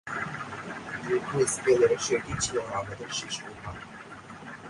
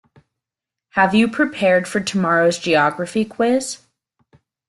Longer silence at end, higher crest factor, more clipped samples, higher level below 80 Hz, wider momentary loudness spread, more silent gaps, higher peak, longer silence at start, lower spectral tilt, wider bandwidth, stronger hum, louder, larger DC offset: second, 0 s vs 0.9 s; about the same, 20 dB vs 18 dB; neither; about the same, -56 dBFS vs -58 dBFS; first, 20 LU vs 7 LU; neither; second, -10 dBFS vs -2 dBFS; second, 0.05 s vs 0.95 s; about the same, -3.5 dB/octave vs -4.5 dB/octave; about the same, 11.5 kHz vs 12.5 kHz; neither; second, -28 LUFS vs -18 LUFS; neither